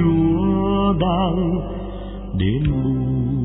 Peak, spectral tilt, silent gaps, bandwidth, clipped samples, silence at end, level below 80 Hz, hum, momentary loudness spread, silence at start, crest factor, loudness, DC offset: -6 dBFS; -12 dB/octave; none; 4 kHz; under 0.1%; 0 s; -30 dBFS; none; 12 LU; 0 s; 12 dB; -20 LUFS; under 0.1%